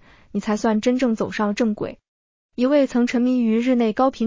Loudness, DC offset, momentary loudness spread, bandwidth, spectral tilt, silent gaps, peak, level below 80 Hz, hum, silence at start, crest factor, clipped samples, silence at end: -21 LUFS; under 0.1%; 10 LU; 7.6 kHz; -6 dB/octave; 2.08-2.49 s; -6 dBFS; -56 dBFS; none; 0.35 s; 14 dB; under 0.1%; 0 s